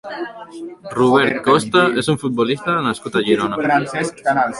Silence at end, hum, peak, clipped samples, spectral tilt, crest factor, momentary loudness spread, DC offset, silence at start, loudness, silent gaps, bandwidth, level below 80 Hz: 0 s; none; -2 dBFS; under 0.1%; -5 dB/octave; 16 dB; 15 LU; under 0.1%; 0.05 s; -17 LUFS; none; 11.5 kHz; -54 dBFS